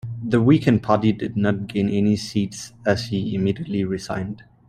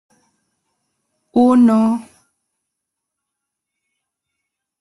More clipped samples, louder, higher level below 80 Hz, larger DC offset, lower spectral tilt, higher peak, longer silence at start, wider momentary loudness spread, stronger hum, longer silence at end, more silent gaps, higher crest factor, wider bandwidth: neither; second, -21 LUFS vs -14 LUFS; first, -52 dBFS vs -62 dBFS; neither; about the same, -7 dB/octave vs -7.5 dB/octave; about the same, -2 dBFS vs -4 dBFS; second, 0.05 s vs 1.35 s; about the same, 10 LU vs 10 LU; neither; second, 0.3 s vs 2.8 s; neither; about the same, 18 dB vs 18 dB; about the same, 12 kHz vs 11.5 kHz